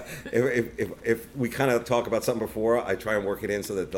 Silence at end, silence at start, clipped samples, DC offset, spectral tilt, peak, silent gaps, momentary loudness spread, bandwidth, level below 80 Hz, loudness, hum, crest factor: 0 s; 0 s; under 0.1%; under 0.1%; -5.5 dB/octave; -10 dBFS; none; 5 LU; 17 kHz; -54 dBFS; -27 LUFS; none; 18 dB